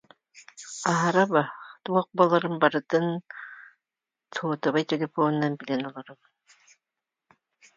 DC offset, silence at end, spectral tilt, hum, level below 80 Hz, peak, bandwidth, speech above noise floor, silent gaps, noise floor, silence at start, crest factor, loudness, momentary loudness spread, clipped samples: under 0.1%; 1.65 s; -5.5 dB/octave; none; -76 dBFS; -4 dBFS; 9.4 kHz; 64 dB; none; -89 dBFS; 0.35 s; 22 dB; -26 LUFS; 18 LU; under 0.1%